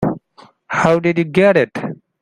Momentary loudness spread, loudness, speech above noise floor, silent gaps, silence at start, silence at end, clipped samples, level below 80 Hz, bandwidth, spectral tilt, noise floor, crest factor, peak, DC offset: 15 LU; -15 LUFS; 34 dB; none; 0 s; 0.3 s; under 0.1%; -50 dBFS; 10.5 kHz; -7 dB/octave; -48 dBFS; 16 dB; 0 dBFS; under 0.1%